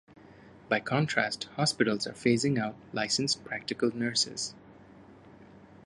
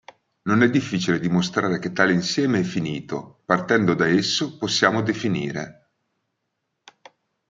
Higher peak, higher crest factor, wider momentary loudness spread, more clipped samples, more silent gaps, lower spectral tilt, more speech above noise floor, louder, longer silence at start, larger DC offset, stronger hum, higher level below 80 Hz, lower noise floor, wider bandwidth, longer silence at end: second, -10 dBFS vs -2 dBFS; about the same, 22 dB vs 22 dB; second, 7 LU vs 11 LU; neither; neither; about the same, -4 dB/octave vs -5 dB/octave; second, 23 dB vs 56 dB; second, -29 LUFS vs -21 LUFS; about the same, 0.45 s vs 0.45 s; neither; neither; second, -68 dBFS vs -62 dBFS; second, -53 dBFS vs -77 dBFS; first, 11.5 kHz vs 8.8 kHz; second, 0.4 s vs 1.8 s